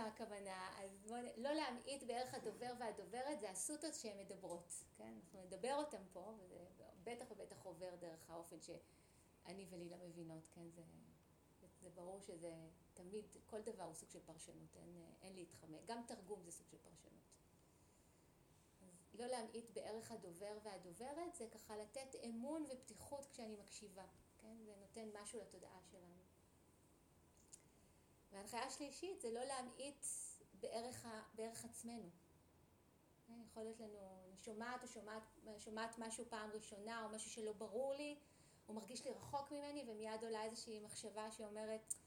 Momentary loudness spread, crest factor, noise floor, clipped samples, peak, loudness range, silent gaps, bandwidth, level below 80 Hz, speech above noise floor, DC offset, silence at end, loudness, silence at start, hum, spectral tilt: 14 LU; 26 dB; -74 dBFS; under 0.1%; -26 dBFS; 9 LU; none; over 20 kHz; -82 dBFS; 21 dB; under 0.1%; 0 s; -52 LUFS; 0 s; none; -3 dB/octave